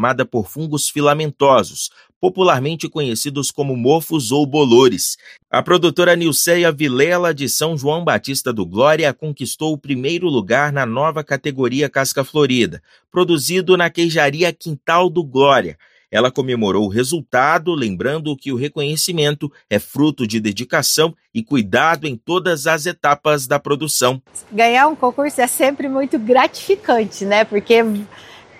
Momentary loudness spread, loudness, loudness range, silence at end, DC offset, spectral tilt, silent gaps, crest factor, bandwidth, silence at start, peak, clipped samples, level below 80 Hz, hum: 8 LU; -16 LUFS; 3 LU; 0.2 s; under 0.1%; -4 dB/octave; 2.16-2.21 s; 16 dB; 16 kHz; 0 s; 0 dBFS; under 0.1%; -58 dBFS; none